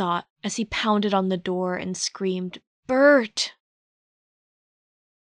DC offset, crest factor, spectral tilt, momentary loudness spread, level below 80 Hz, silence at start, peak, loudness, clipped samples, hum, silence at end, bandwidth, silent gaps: under 0.1%; 18 dB; -4 dB/octave; 13 LU; -60 dBFS; 0 s; -8 dBFS; -23 LUFS; under 0.1%; none; 1.7 s; 10.5 kHz; 0.30-0.36 s, 2.67-2.83 s